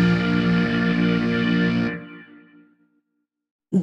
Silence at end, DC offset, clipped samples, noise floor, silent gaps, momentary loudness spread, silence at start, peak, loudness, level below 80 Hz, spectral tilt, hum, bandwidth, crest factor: 0 s; under 0.1%; under 0.1%; -77 dBFS; 3.51-3.59 s; 7 LU; 0 s; -10 dBFS; -21 LUFS; -48 dBFS; -7.5 dB/octave; none; 6.8 kHz; 14 dB